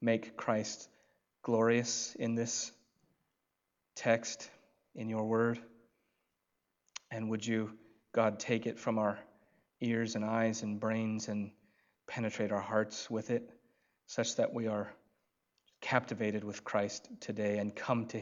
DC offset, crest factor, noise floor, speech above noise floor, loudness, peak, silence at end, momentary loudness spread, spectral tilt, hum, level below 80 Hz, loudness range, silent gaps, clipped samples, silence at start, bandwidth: under 0.1%; 24 dB; -85 dBFS; 50 dB; -36 LUFS; -12 dBFS; 0 s; 12 LU; -4.5 dB/octave; none; -84 dBFS; 3 LU; none; under 0.1%; 0 s; 7.8 kHz